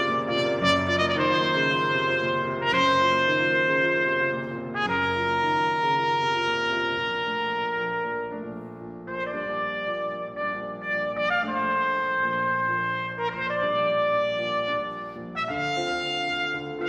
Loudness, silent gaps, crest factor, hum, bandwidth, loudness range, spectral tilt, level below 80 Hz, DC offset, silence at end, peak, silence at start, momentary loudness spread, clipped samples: -25 LUFS; none; 18 dB; none; 10.5 kHz; 7 LU; -4.5 dB/octave; -62 dBFS; under 0.1%; 0 s; -6 dBFS; 0 s; 9 LU; under 0.1%